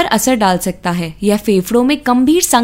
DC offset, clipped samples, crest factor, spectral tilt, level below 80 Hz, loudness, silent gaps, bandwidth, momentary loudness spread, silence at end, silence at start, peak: under 0.1%; under 0.1%; 12 dB; -4 dB/octave; -40 dBFS; -13 LUFS; none; 16.5 kHz; 7 LU; 0 s; 0 s; 0 dBFS